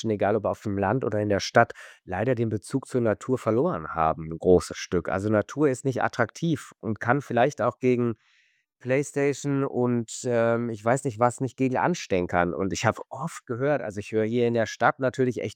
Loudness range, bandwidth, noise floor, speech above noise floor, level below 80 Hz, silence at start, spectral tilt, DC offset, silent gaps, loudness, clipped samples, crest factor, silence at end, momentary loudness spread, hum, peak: 1 LU; 15.5 kHz; -66 dBFS; 40 dB; -56 dBFS; 0 s; -6 dB/octave; under 0.1%; none; -26 LUFS; under 0.1%; 22 dB; 0 s; 6 LU; none; -4 dBFS